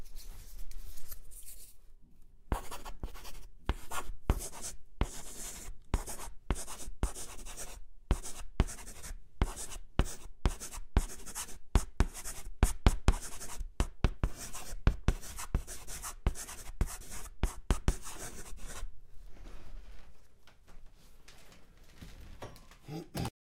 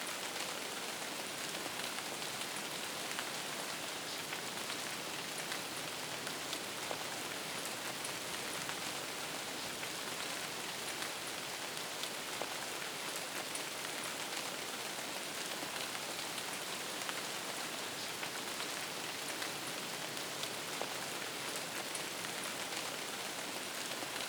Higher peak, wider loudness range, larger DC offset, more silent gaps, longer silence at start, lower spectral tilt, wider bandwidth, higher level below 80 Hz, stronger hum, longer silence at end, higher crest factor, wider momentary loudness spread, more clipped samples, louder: first, -6 dBFS vs -18 dBFS; first, 15 LU vs 0 LU; neither; neither; about the same, 0 s vs 0 s; first, -4.5 dB/octave vs -1 dB/octave; second, 16 kHz vs over 20 kHz; first, -38 dBFS vs -80 dBFS; neither; first, 0.2 s vs 0 s; about the same, 28 dB vs 24 dB; first, 18 LU vs 1 LU; neither; about the same, -39 LUFS vs -40 LUFS